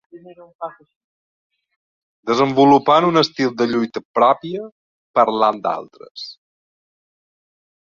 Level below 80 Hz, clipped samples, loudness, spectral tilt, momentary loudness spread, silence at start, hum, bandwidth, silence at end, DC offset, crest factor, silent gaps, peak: -64 dBFS; under 0.1%; -17 LUFS; -6 dB/octave; 20 LU; 0.15 s; none; 7.4 kHz; 1.65 s; under 0.1%; 18 dB; 0.55-0.59 s, 0.96-1.50 s, 1.76-2.23 s, 4.05-4.14 s, 4.72-5.14 s, 6.11-6.15 s; -2 dBFS